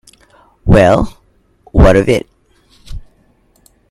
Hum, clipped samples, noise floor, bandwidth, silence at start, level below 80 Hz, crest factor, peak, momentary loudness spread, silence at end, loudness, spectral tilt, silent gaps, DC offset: none; 0.3%; -53 dBFS; 13 kHz; 0.65 s; -22 dBFS; 14 dB; 0 dBFS; 26 LU; 0.9 s; -11 LUFS; -7.5 dB/octave; none; under 0.1%